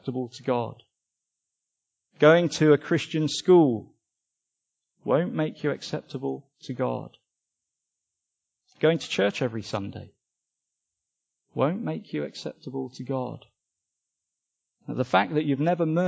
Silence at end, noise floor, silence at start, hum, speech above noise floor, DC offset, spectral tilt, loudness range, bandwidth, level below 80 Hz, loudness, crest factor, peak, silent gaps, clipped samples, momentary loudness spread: 0 s; -84 dBFS; 0.05 s; none; 59 dB; under 0.1%; -6 dB/octave; 10 LU; 8 kHz; -68 dBFS; -25 LUFS; 22 dB; -4 dBFS; none; under 0.1%; 17 LU